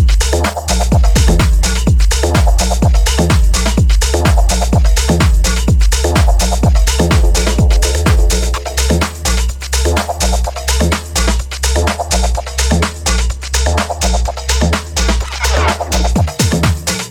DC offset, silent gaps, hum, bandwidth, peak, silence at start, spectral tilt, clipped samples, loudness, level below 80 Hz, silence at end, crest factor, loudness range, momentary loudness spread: under 0.1%; none; none; 17 kHz; 0 dBFS; 0 s; -4.5 dB/octave; under 0.1%; -13 LUFS; -14 dBFS; 0 s; 12 dB; 3 LU; 4 LU